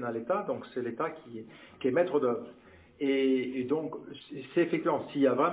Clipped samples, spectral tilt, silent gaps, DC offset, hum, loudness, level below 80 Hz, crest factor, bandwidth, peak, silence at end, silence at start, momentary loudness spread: under 0.1%; -5 dB/octave; none; under 0.1%; none; -31 LUFS; -72 dBFS; 18 dB; 4 kHz; -14 dBFS; 0 s; 0 s; 17 LU